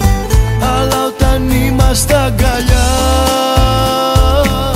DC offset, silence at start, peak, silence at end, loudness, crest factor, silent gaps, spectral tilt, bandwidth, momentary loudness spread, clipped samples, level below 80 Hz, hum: under 0.1%; 0 s; 0 dBFS; 0 s; -12 LUFS; 10 dB; none; -5 dB/octave; 16.5 kHz; 2 LU; under 0.1%; -14 dBFS; none